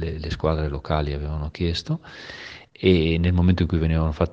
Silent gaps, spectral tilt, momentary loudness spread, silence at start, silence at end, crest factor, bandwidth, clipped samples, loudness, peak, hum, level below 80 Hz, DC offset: none; -7.5 dB/octave; 17 LU; 0 s; 0 s; 20 dB; 7.4 kHz; under 0.1%; -23 LUFS; -4 dBFS; none; -32 dBFS; under 0.1%